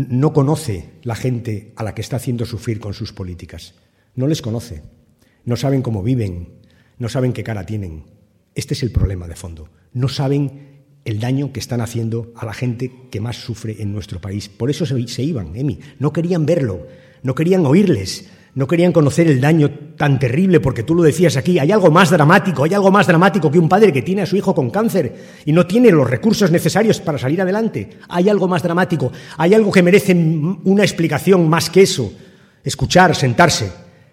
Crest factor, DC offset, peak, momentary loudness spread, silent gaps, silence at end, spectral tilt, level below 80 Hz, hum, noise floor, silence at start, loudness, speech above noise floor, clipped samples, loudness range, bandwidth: 16 dB; under 0.1%; 0 dBFS; 16 LU; none; 0.3 s; -6 dB/octave; -40 dBFS; none; -53 dBFS; 0 s; -16 LUFS; 38 dB; under 0.1%; 11 LU; 16 kHz